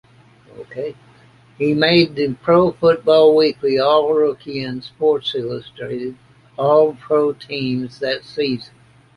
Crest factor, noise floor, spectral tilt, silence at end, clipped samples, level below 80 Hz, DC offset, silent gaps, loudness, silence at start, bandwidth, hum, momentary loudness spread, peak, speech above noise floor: 18 dB; -48 dBFS; -7 dB/octave; 0.5 s; under 0.1%; -56 dBFS; under 0.1%; none; -17 LUFS; 0.55 s; 11 kHz; none; 15 LU; 0 dBFS; 31 dB